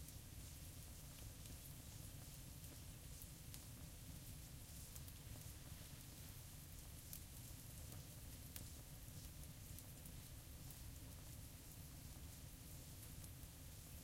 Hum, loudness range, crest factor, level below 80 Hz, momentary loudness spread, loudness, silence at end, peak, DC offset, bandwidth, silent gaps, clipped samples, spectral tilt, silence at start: none; 1 LU; 28 dB; -62 dBFS; 2 LU; -56 LUFS; 0 s; -28 dBFS; under 0.1%; 16.5 kHz; none; under 0.1%; -3.5 dB/octave; 0 s